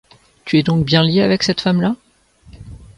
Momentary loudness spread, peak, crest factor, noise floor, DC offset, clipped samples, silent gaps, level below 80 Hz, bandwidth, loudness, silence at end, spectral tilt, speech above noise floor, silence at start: 9 LU; -2 dBFS; 16 dB; -49 dBFS; under 0.1%; under 0.1%; none; -46 dBFS; 11 kHz; -15 LUFS; 0.2 s; -6 dB/octave; 34 dB; 0.45 s